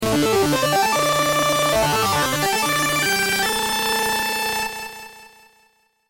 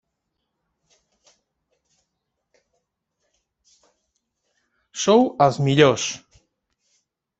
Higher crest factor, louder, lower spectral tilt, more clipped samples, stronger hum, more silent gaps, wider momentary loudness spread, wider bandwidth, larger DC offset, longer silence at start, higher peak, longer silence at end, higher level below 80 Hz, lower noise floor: second, 12 dB vs 24 dB; about the same, -19 LUFS vs -18 LUFS; second, -2.5 dB/octave vs -5 dB/octave; neither; first, 60 Hz at -60 dBFS vs none; neither; second, 5 LU vs 16 LU; first, 17 kHz vs 8.2 kHz; neither; second, 0 s vs 4.95 s; second, -8 dBFS vs -2 dBFS; second, 0.85 s vs 1.2 s; first, -46 dBFS vs -64 dBFS; second, -61 dBFS vs -78 dBFS